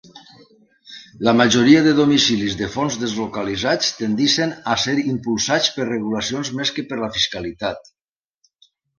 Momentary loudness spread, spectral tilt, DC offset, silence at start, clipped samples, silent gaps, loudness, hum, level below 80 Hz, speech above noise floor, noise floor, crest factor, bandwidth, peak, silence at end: 12 LU; -4 dB/octave; under 0.1%; 0.15 s; under 0.1%; none; -18 LUFS; none; -52 dBFS; 48 dB; -66 dBFS; 20 dB; 10 kHz; 0 dBFS; 1.2 s